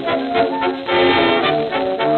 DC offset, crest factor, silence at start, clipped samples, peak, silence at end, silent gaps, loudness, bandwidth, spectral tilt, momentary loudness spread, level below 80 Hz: under 0.1%; 14 dB; 0 s; under 0.1%; -4 dBFS; 0 s; none; -16 LUFS; 4.7 kHz; -7 dB/octave; 6 LU; -50 dBFS